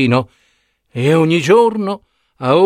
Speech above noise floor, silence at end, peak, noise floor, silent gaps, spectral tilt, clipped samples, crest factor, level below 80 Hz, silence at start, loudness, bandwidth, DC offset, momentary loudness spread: 48 dB; 0 s; 0 dBFS; -61 dBFS; none; -6.5 dB/octave; under 0.1%; 14 dB; -56 dBFS; 0 s; -14 LUFS; 14.5 kHz; under 0.1%; 17 LU